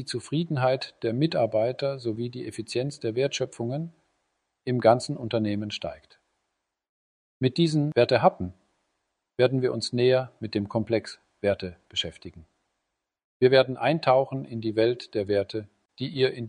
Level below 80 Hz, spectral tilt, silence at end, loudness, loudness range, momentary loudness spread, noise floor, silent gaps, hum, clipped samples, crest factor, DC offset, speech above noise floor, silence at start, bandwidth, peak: -64 dBFS; -6 dB/octave; 0 s; -26 LUFS; 4 LU; 13 LU; -82 dBFS; 6.89-7.40 s, 13.24-13.40 s; none; under 0.1%; 22 dB; under 0.1%; 57 dB; 0 s; 11 kHz; -6 dBFS